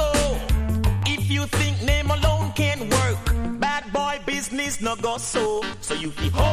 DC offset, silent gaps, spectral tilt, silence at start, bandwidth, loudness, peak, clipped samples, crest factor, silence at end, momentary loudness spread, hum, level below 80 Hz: under 0.1%; none; -4.5 dB/octave; 0 s; 16 kHz; -23 LUFS; -6 dBFS; under 0.1%; 16 dB; 0 s; 4 LU; none; -28 dBFS